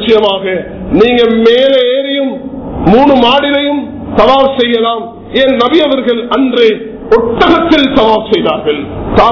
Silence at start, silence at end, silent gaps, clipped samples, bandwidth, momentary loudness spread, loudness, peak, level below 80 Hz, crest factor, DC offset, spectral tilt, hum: 0 s; 0 s; none; 3%; 6 kHz; 9 LU; -9 LUFS; 0 dBFS; -32 dBFS; 8 dB; under 0.1%; -6.5 dB/octave; none